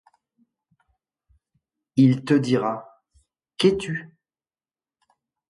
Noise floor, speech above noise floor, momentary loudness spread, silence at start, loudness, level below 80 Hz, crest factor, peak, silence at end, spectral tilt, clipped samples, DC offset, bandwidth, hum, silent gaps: under -90 dBFS; over 70 dB; 14 LU; 1.95 s; -22 LUFS; -60 dBFS; 20 dB; -6 dBFS; 1.45 s; -7 dB/octave; under 0.1%; under 0.1%; 11.5 kHz; none; none